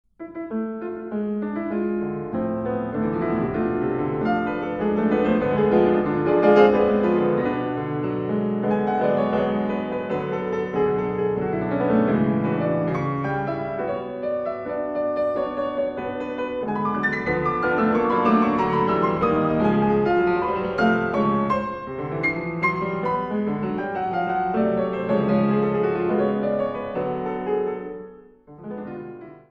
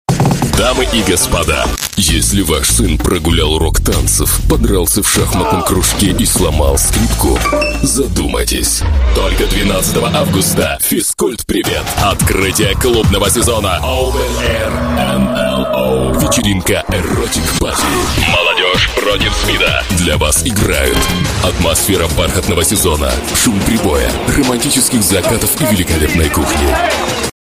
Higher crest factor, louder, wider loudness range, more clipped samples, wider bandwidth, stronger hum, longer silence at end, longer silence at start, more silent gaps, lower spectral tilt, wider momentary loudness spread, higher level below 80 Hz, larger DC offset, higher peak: first, 20 dB vs 12 dB; second, -23 LUFS vs -12 LUFS; first, 6 LU vs 2 LU; neither; second, 6.2 kHz vs 16 kHz; neither; about the same, 0.1 s vs 0.1 s; about the same, 0.2 s vs 0.1 s; neither; first, -9 dB/octave vs -3.5 dB/octave; first, 9 LU vs 4 LU; second, -50 dBFS vs -20 dBFS; second, under 0.1% vs 0.4%; about the same, -2 dBFS vs 0 dBFS